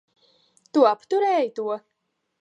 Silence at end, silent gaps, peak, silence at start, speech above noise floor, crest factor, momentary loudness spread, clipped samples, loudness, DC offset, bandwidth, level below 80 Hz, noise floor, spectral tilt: 0.65 s; none; -4 dBFS; 0.75 s; 40 dB; 20 dB; 11 LU; under 0.1%; -23 LUFS; under 0.1%; 10 kHz; -86 dBFS; -61 dBFS; -5 dB/octave